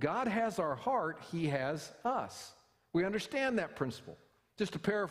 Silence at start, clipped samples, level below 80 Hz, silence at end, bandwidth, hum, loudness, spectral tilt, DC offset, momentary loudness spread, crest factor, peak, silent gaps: 0 s; under 0.1%; -68 dBFS; 0 s; 15.5 kHz; none; -36 LUFS; -5.5 dB/octave; under 0.1%; 10 LU; 18 dB; -18 dBFS; none